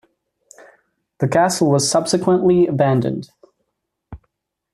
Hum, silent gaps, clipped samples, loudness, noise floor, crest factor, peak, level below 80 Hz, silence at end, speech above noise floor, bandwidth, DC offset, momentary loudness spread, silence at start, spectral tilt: none; none; under 0.1%; -17 LUFS; -76 dBFS; 16 dB; -2 dBFS; -54 dBFS; 0.6 s; 60 dB; 14 kHz; under 0.1%; 8 LU; 1.2 s; -5.5 dB/octave